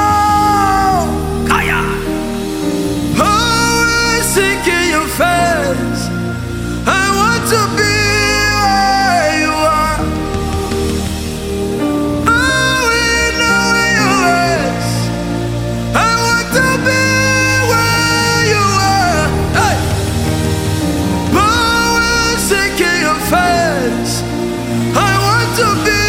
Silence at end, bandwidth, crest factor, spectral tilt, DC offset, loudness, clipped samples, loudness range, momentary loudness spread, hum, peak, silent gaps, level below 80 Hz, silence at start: 0 s; 16.5 kHz; 12 dB; -4 dB/octave; under 0.1%; -13 LUFS; under 0.1%; 2 LU; 7 LU; none; 0 dBFS; none; -28 dBFS; 0 s